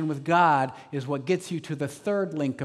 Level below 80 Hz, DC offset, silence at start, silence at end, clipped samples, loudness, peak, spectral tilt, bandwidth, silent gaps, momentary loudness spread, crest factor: -76 dBFS; under 0.1%; 0 s; 0 s; under 0.1%; -26 LUFS; -8 dBFS; -6.5 dB/octave; 13.5 kHz; none; 12 LU; 18 dB